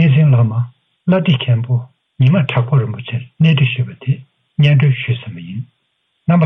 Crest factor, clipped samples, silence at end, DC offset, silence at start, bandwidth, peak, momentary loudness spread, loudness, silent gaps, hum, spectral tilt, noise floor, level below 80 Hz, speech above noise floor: 12 dB; under 0.1%; 0 s; under 0.1%; 0 s; 3.9 kHz; -2 dBFS; 15 LU; -15 LUFS; none; none; -9.5 dB/octave; -66 dBFS; -54 dBFS; 52 dB